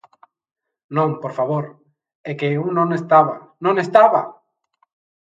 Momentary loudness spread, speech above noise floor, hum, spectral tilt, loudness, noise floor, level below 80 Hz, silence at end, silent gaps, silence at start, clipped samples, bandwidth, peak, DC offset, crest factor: 16 LU; 49 dB; none; -8 dB/octave; -18 LUFS; -66 dBFS; -70 dBFS; 0.9 s; 2.15-2.24 s; 0.9 s; under 0.1%; 7.8 kHz; 0 dBFS; under 0.1%; 20 dB